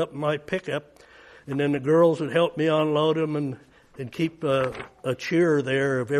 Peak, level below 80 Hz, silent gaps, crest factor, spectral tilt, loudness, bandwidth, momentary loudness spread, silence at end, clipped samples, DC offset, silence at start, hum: -8 dBFS; -62 dBFS; none; 16 dB; -6.5 dB/octave; -24 LUFS; 12.5 kHz; 12 LU; 0 s; under 0.1%; under 0.1%; 0 s; none